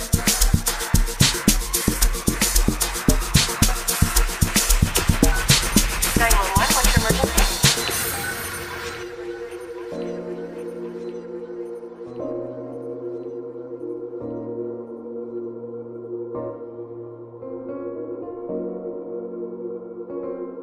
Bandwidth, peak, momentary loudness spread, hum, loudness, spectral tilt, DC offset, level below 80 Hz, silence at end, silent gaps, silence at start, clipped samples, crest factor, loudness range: 15.5 kHz; -2 dBFS; 16 LU; none; -22 LUFS; -3 dB/octave; under 0.1%; -28 dBFS; 0 s; none; 0 s; under 0.1%; 22 dB; 14 LU